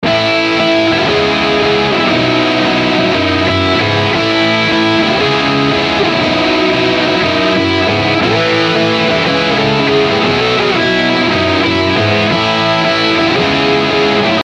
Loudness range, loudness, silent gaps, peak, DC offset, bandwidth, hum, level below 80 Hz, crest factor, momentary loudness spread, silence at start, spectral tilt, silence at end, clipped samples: 0 LU; -11 LUFS; none; -2 dBFS; under 0.1%; 10 kHz; none; -42 dBFS; 10 dB; 1 LU; 0 s; -5 dB/octave; 0 s; under 0.1%